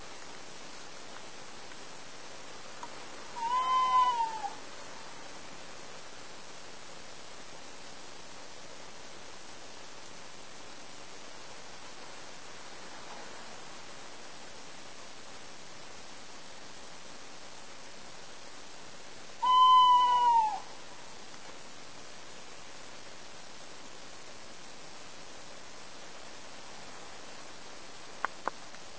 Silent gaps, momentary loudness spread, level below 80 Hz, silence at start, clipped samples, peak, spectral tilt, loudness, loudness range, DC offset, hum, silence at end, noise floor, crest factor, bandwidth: none; 20 LU; -70 dBFS; 0 s; under 0.1%; -12 dBFS; -1.5 dB/octave; -28 LUFS; 21 LU; 0.7%; none; 0 s; -50 dBFS; 24 dB; 8 kHz